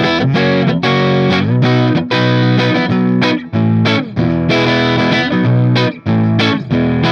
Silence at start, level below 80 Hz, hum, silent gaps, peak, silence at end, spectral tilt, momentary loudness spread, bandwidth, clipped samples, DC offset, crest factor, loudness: 0 s; -42 dBFS; none; none; 0 dBFS; 0 s; -7 dB/octave; 3 LU; 7 kHz; under 0.1%; under 0.1%; 12 dB; -13 LUFS